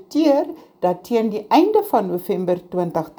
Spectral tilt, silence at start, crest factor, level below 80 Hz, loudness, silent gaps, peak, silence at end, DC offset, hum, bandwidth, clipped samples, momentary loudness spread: -7 dB/octave; 0.1 s; 16 dB; -62 dBFS; -19 LUFS; none; -2 dBFS; 0.1 s; under 0.1%; none; over 20 kHz; under 0.1%; 7 LU